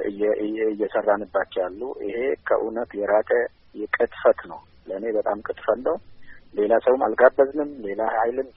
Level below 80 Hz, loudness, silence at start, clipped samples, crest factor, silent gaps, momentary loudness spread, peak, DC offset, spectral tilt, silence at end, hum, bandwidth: -58 dBFS; -23 LUFS; 0 s; under 0.1%; 22 dB; none; 12 LU; -2 dBFS; under 0.1%; -3.5 dB/octave; 0.05 s; none; 4.3 kHz